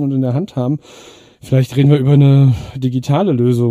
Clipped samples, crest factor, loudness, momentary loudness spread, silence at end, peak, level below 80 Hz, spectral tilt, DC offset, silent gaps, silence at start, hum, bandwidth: under 0.1%; 12 dB; -14 LUFS; 10 LU; 0 s; 0 dBFS; -44 dBFS; -9 dB/octave; under 0.1%; none; 0 s; none; 10 kHz